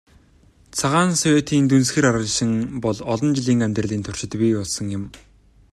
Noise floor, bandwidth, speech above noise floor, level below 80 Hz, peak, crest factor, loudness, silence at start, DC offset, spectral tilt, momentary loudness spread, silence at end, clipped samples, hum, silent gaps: -53 dBFS; 13 kHz; 34 dB; -50 dBFS; -4 dBFS; 16 dB; -20 LUFS; 0.75 s; under 0.1%; -5 dB/octave; 10 LU; 0.55 s; under 0.1%; none; none